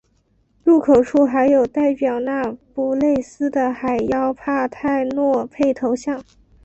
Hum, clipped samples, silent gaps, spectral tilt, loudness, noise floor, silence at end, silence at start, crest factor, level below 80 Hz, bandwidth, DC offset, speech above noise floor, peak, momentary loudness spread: none; under 0.1%; none; -6.5 dB/octave; -19 LUFS; -61 dBFS; 0.45 s; 0.65 s; 16 dB; -52 dBFS; 8.2 kHz; under 0.1%; 44 dB; -4 dBFS; 8 LU